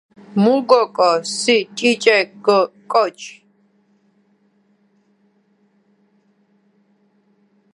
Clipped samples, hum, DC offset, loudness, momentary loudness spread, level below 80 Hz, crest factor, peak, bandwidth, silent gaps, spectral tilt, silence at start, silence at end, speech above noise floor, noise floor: under 0.1%; 50 Hz at -50 dBFS; under 0.1%; -16 LUFS; 9 LU; -74 dBFS; 20 dB; 0 dBFS; 11.5 kHz; none; -4 dB/octave; 0.3 s; 4.45 s; 44 dB; -60 dBFS